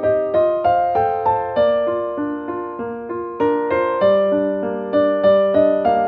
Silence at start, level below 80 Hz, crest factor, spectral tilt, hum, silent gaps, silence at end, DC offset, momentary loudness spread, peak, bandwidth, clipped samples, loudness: 0 s; -50 dBFS; 14 dB; -9 dB/octave; none; none; 0 s; under 0.1%; 11 LU; -4 dBFS; 4.6 kHz; under 0.1%; -18 LUFS